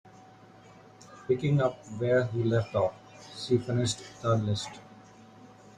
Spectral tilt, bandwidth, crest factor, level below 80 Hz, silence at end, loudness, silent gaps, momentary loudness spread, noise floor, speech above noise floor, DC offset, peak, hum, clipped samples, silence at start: -6 dB/octave; 11 kHz; 18 dB; -62 dBFS; 0.3 s; -29 LUFS; none; 15 LU; -53 dBFS; 25 dB; under 0.1%; -12 dBFS; none; under 0.1%; 0.05 s